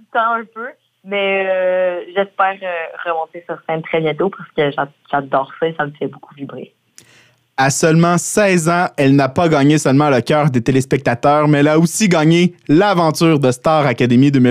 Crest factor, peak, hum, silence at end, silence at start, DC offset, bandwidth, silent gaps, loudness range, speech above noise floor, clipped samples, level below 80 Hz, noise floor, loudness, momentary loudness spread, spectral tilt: 14 dB; -2 dBFS; none; 0 s; 0.15 s; under 0.1%; 15.5 kHz; none; 7 LU; 37 dB; under 0.1%; -54 dBFS; -51 dBFS; -15 LUFS; 11 LU; -5.5 dB/octave